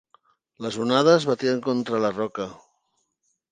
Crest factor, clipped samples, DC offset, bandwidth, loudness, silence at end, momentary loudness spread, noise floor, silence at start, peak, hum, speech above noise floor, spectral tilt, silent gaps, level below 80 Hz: 20 dB; under 0.1%; under 0.1%; 9.6 kHz; -23 LUFS; 0.95 s; 16 LU; -74 dBFS; 0.6 s; -4 dBFS; none; 51 dB; -5.5 dB/octave; none; -68 dBFS